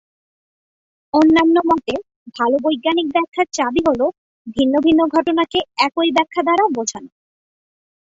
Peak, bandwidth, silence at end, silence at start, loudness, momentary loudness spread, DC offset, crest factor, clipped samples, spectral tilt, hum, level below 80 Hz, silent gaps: -2 dBFS; 7.8 kHz; 1.1 s; 1.15 s; -17 LUFS; 9 LU; under 0.1%; 16 dB; under 0.1%; -3.5 dB/octave; none; -54 dBFS; 2.16-2.26 s, 3.28-3.32 s, 4.18-4.45 s